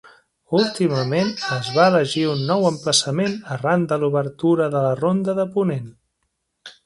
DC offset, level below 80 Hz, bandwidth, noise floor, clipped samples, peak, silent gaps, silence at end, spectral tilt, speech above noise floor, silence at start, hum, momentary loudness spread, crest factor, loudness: under 0.1%; -62 dBFS; 11.5 kHz; -74 dBFS; under 0.1%; -2 dBFS; none; 0.15 s; -5 dB/octave; 54 dB; 0.05 s; none; 7 LU; 20 dB; -20 LUFS